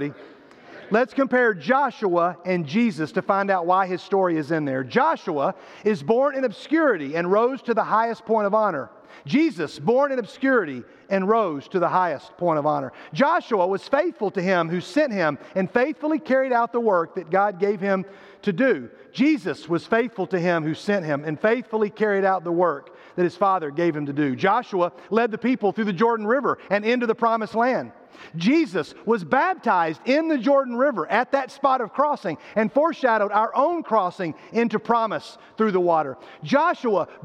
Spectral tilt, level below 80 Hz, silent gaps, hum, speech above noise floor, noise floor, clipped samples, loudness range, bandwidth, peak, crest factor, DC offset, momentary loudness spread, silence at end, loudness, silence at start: -7 dB/octave; -72 dBFS; none; none; 22 dB; -44 dBFS; under 0.1%; 2 LU; 10 kHz; -6 dBFS; 16 dB; under 0.1%; 6 LU; 0.05 s; -22 LUFS; 0 s